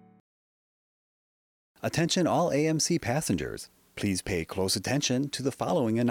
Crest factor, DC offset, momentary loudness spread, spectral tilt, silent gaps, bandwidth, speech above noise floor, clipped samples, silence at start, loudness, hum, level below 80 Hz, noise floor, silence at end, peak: 14 dB; under 0.1%; 8 LU; -4.5 dB/octave; none; 18 kHz; over 62 dB; under 0.1%; 1.85 s; -28 LUFS; none; -58 dBFS; under -90 dBFS; 0 s; -14 dBFS